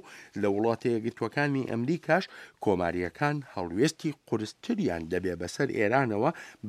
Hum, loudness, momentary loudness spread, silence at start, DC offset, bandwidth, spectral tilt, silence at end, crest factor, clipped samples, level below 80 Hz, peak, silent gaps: none; -29 LUFS; 8 LU; 0.05 s; under 0.1%; 14.5 kHz; -6 dB/octave; 0 s; 20 dB; under 0.1%; -62 dBFS; -10 dBFS; none